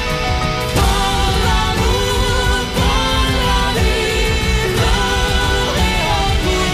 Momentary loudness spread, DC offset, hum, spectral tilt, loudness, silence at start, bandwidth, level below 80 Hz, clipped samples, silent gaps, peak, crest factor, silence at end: 1 LU; under 0.1%; none; -4 dB/octave; -16 LUFS; 0 s; 15.5 kHz; -20 dBFS; under 0.1%; none; -2 dBFS; 14 dB; 0 s